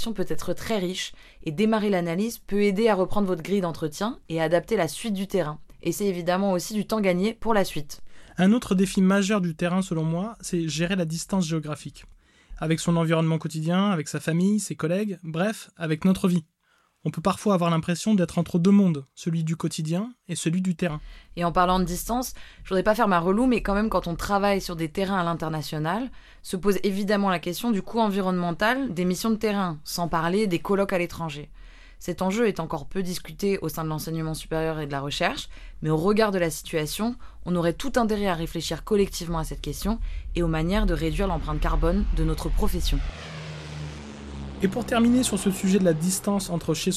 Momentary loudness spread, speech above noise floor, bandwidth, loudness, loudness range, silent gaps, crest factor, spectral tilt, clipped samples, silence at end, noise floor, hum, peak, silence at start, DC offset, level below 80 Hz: 11 LU; 42 dB; 15 kHz; -25 LUFS; 4 LU; none; 18 dB; -5.5 dB/octave; under 0.1%; 0 s; -66 dBFS; none; -6 dBFS; 0 s; under 0.1%; -38 dBFS